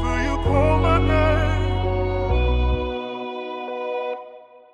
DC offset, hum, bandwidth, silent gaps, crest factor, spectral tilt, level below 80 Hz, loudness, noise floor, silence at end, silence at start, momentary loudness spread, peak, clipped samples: under 0.1%; none; 9 kHz; none; 16 dB; -7.5 dB/octave; -26 dBFS; -22 LUFS; -44 dBFS; 0.3 s; 0 s; 12 LU; -6 dBFS; under 0.1%